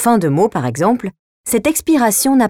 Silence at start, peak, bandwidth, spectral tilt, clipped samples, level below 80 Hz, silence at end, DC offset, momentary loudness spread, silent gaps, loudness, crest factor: 0 s; -2 dBFS; 18 kHz; -5 dB/octave; under 0.1%; -48 dBFS; 0 s; under 0.1%; 9 LU; 1.19-1.44 s; -15 LUFS; 12 dB